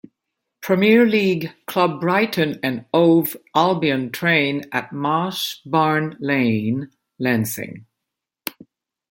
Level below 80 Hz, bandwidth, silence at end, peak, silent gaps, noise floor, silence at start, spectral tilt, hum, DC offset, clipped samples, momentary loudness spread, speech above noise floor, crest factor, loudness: -64 dBFS; 17 kHz; 0.6 s; -2 dBFS; none; -83 dBFS; 0.6 s; -5.5 dB/octave; none; under 0.1%; under 0.1%; 13 LU; 64 dB; 18 dB; -19 LUFS